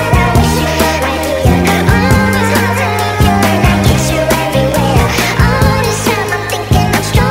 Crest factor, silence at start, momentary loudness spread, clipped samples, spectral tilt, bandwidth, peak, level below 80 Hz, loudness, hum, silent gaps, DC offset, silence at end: 10 dB; 0 s; 3 LU; under 0.1%; -5 dB/octave; 16.5 kHz; 0 dBFS; -20 dBFS; -11 LUFS; none; none; under 0.1%; 0 s